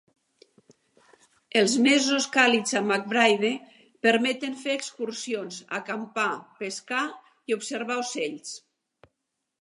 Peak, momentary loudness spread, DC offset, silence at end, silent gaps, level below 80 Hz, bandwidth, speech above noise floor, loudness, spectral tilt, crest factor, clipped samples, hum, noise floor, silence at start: -4 dBFS; 14 LU; under 0.1%; 1.05 s; none; -80 dBFS; 11.5 kHz; 56 dB; -25 LUFS; -2.5 dB/octave; 24 dB; under 0.1%; none; -82 dBFS; 1.55 s